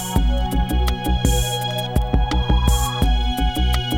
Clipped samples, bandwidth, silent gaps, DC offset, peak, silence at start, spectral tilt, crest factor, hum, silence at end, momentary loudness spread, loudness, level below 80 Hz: under 0.1%; 16.5 kHz; none; under 0.1%; -4 dBFS; 0 s; -5 dB/octave; 16 dB; none; 0 s; 3 LU; -20 LUFS; -20 dBFS